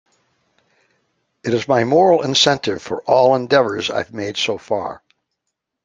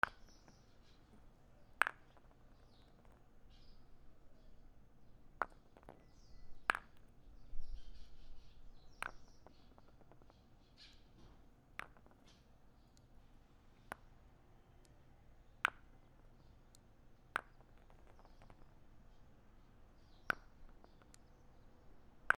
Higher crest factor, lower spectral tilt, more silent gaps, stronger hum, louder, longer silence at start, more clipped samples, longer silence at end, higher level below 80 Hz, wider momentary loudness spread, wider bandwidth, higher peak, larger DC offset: second, 18 dB vs 38 dB; about the same, -4 dB/octave vs -3 dB/octave; neither; neither; first, -17 LUFS vs -44 LUFS; first, 1.45 s vs 0 s; neither; first, 0.9 s vs 0.05 s; about the same, -60 dBFS vs -60 dBFS; second, 11 LU vs 27 LU; second, 9.6 kHz vs 12 kHz; first, 0 dBFS vs -10 dBFS; neither